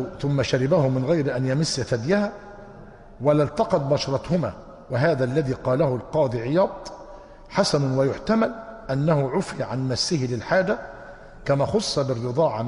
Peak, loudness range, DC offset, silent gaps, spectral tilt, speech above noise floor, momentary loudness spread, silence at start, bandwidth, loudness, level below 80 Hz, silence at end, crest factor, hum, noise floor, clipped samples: -6 dBFS; 1 LU; under 0.1%; none; -6 dB/octave; 21 dB; 14 LU; 0 s; 11.5 kHz; -23 LUFS; -48 dBFS; 0 s; 16 dB; none; -44 dBFS; under 0.1%